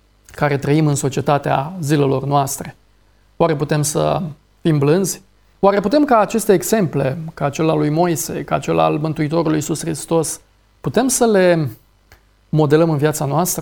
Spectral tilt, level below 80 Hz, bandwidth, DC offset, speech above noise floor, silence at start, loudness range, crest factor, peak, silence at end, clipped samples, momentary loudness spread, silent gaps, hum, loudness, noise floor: -5.5 dB/octave; -48 dBFS; 19 kHz; under 0.1%; 38 dB; 0.35 s; 2 LU; 16 dB; -2 dBFS; 0 s; under 0.1%; 9 LU; none; none; -17 LUFS; -54 dBFS